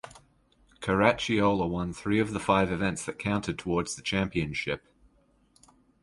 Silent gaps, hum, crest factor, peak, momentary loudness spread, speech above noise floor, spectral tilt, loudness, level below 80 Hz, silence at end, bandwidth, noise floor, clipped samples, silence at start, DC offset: none; none; 24 dB; -6 dBFS; 9 LU; 37 dB; -5 dB/octave; -28 LUFS; -50 dBFS; 1.25 s; 11.5 kHz; -65 dBFS; under 0.1%; 0.05 s; under 0.1%